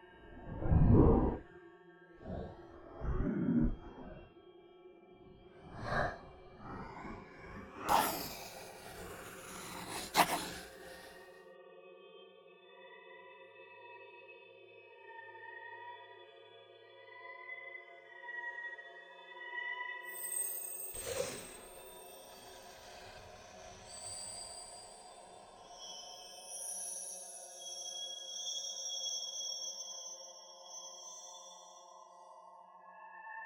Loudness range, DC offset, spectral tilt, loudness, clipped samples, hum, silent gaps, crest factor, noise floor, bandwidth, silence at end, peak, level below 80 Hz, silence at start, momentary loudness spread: 16 LU; under 0.1%; -4 dB/octave; -39 LUFS; under 0.1%; none; none; 28 dB; -59 dBFS; 19 kHz; 0 s; -12 dBFS; -48 dBFS; 0 s; 23 LU